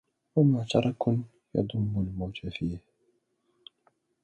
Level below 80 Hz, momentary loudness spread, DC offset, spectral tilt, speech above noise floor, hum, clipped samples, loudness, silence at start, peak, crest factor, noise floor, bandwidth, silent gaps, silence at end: -52 dBFS; 11 LU; under 0.1%; -8 dB/octave; 46 dB; none; under 0.1%; -29 LUFS; 0.35 s; -10 dBFS; 20 dB; -73 dBFS; 9 kHz; none; 1.45 s